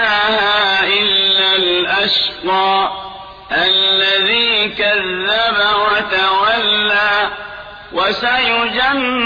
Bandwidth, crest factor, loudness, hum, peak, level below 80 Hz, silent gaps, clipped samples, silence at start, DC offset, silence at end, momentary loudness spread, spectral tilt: 5.2 kHz; 12 dB; -13 LUFS; none; -4 dBFS; -48 dBFS; none; under 0.1%; 0 s; under 0.1%; 0 s; 9 LU; -4 dB/octave